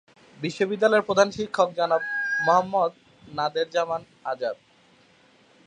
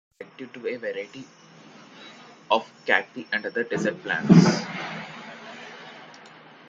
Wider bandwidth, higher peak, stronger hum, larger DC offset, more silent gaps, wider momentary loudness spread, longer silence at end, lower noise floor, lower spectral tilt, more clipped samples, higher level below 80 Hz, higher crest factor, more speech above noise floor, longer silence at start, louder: first, 10 kHz vs 7.8 kHz; about the same, -4 dBFS vs -2 dBFS; neither; neither; neither; second, 12 LU vs 27 LU; first, 1.15 s vs 0.4 s; first, -58 dBFS vs -49 dBFS; second, -4.5 dB/octave vs -6 dB/octave; neither; about the same, -68 dBFS vs -64 dBFS; about the same, 22 dB vs 24 dB; first, 34 dB vs 26 dB; first, 0.4 s vs 0.2 s; about the same, -24 LUFS vs -24 LUFS